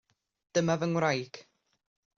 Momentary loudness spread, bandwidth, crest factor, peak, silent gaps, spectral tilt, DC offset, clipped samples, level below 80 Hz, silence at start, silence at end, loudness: 16 LU; 7.4 kHz; 18 dB; -14 dBFS; none; -5 dB/octave; under 0.1%; under 0.1%; -72 dBFS; 0.55 s; 0.75 s; -30 LUFS